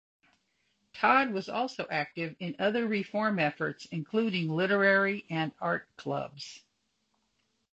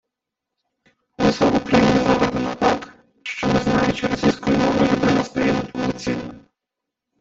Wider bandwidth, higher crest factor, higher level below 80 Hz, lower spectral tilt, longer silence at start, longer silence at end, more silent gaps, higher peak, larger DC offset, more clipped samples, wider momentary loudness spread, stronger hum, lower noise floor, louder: about the same, 8.2 kHz vs 8 kHz; about the same, 22 dB vs 18 dB; second, -72 dBFS vs -44 dBFS; about the same, -6 dB/octave vs -6 dB/octave; second, 0.95 s vs 1.2 s; first, 1.15 s vs 0.8 s; neither; second, -10 dBFS vs -4 dBFS; neither; neither; about the same, 12 LU vs 10 LU; neither; second, -77 dBFS vs -83 dBFS; second, -30 LUFS vs -19 LUFS